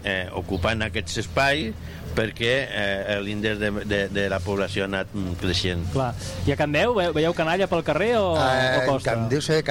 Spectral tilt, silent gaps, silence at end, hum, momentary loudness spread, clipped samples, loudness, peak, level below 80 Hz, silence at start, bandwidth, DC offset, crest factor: -5 dB/octave; none; 0 s; none; 7 LU; under 0.1%; -24 LUFS; -8 dBFS; -42 dBFS; 0 s; 16.5 kHz; under 0.1%; 16 dB